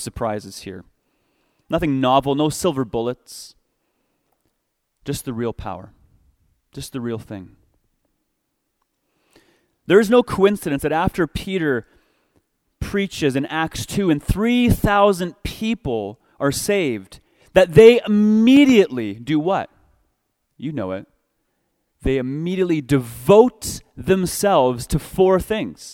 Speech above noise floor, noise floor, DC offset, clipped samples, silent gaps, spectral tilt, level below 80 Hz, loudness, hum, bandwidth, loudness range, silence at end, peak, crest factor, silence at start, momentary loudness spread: 55 dB; -73 dBFS; under 0.1%; under 0.1%; none; -5.5 dB/octave; -40 dBFS; -18 LUFS; none; 17 kHz; 17 LU; 0 s; 0 dBFS; 20 dB; 0 s; 19 LU